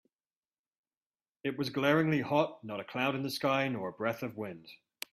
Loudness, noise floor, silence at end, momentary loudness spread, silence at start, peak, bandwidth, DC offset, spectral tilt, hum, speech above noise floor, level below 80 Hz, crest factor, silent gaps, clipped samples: -32 LUFS; under -90 dBFS; 0.4 s; 14 LU; 1.45 s; -14 dBFS; 15.5 kHz; under 0.1%; -6 dB/octave; none; over 58 dB; -74 dBFS; 20 dB; none; under 0.1%